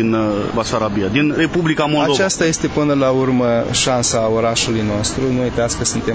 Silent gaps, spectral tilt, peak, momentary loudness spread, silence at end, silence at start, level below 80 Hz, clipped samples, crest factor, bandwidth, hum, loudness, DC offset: none; -4.5 dB/octave; -2 dBFS; 3 LU; 0 s; 0 s; -38 dBFS; under 0.1%; 14 dB; 8 kHz; none; -16 LUFS; under 0.1%